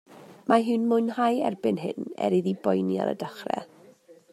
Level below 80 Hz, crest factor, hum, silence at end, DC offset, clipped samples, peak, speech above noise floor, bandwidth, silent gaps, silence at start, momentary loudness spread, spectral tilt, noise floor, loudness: -76 dBFS; 20 dB; none; 0.2 s; under 0.1%; under 0.1%; -6 dBFS; 28 dB; 13.5 kHz; none; 0.1 s; 10 LU; -7 dB/octave; -54 dBFS; -26 LUFS